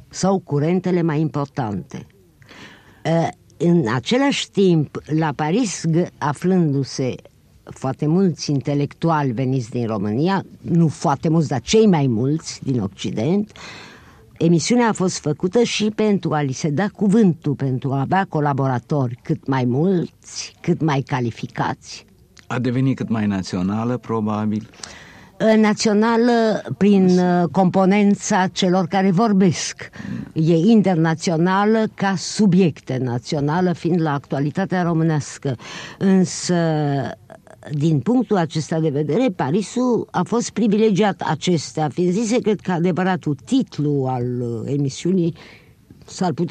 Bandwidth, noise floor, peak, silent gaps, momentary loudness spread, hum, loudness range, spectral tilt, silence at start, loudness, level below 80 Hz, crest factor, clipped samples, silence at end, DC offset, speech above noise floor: 9.6 kHz; -46 dBFS; -4 dBFS; none; 10 LU; none; 5 LU; -6 dB/octave; 0.1 s; -19 LUFS; -56 dBFS; 14 dB; under 0.1%; 0 s; under 0.1%; 27 dB